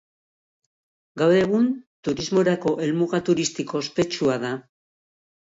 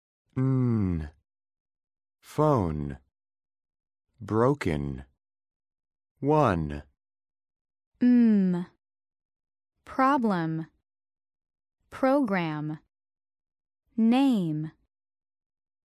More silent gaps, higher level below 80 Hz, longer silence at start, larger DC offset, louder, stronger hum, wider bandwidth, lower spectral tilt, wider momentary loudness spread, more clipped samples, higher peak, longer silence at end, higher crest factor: second, 1.87-2.03 s vs 1.60-1.66 s, 5.56-5.60 s, 6.11-6.15 s, 7.61-7.65 s, 7.87-7.92 s, 9.25-9.29 s; second, -60 dBFS vs -50 dBFS; first, 1.15 s vs 0.35 s; neither; first, -23 LUFS vs -26 LUFS; neither; second, 7.8 kHz vs 12.5 kHz; second, -5.5 dB/octave vs -8.5 dB/octave; second, 10 LU vs 17 LU; neither; about the same, -8 dBFS vs -10 dBFS; second, 0.85 s vs 1.2 s; about the same, 16 dB vs 20 dB